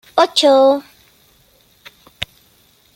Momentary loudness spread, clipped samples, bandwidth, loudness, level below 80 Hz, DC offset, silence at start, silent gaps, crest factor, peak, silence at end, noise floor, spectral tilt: 18 LU; under 0.1%; 16 kHz; -13 LUFS; -56 dBFS; under 0.1%; 0.15 s; none; 16 dB; -2 dBFS; 0.7 s; -54 dBFS; -2.5 dB/octave